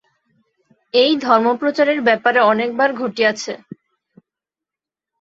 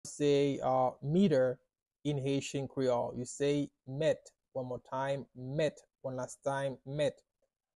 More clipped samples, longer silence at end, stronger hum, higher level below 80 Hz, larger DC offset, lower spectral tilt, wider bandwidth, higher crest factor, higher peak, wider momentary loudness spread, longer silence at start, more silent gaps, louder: neither; first, 1.65 s vs 0.65 s; neither; about the same, -68 dBFS vs -68 dBFS; neither; second, -4 dB/octave vs -6 dB/octave; second, 7.8 kHz vs 12 kHz; about the same, 18 dB vs 16 dB; first, -2 dBFS vs -18 dBFS; second, 7 LU vs 11 LU; first, 0.95 s vs 0.05 s; second, none vs 1.82-1.86 s; first, -16 LUFS vs -34 LUFS